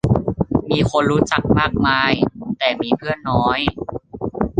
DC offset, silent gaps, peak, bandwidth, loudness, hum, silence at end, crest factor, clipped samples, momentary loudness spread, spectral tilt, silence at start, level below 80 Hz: under 0.1%; none; -2 dBFS; 9.6 kHz; -18 LUFS; none; 0 s; 18 dB; under 0.1%; 8 LU; -6 dB/octave; 0.05 s; -36 dBFS